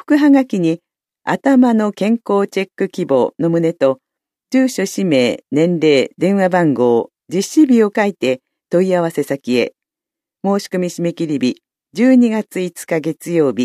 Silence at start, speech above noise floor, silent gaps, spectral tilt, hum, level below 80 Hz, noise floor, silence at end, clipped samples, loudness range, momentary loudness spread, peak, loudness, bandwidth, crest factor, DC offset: 0.1 s; 72 dB; none; -6 dB/octave; none; -68 dBFS; -86 dBFS; 0 s; under 0.1%; 4 LU; 9 LU; 0 dBFS; -16 LUFS; 14 kHz; 14 dB; under 0.1%